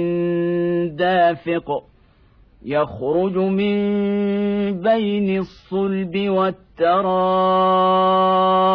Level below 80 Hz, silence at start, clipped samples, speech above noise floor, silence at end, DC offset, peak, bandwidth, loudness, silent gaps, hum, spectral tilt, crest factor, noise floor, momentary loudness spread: -52 dBFS; 0 s; under 0.1%; 34 dB; 0 s; under 0.1%; -6 dBFS; 5.4 kHz; -19 LUFS; none; none; -9.5 dB/octave; 12 dB; -52 dBFS; 8 LU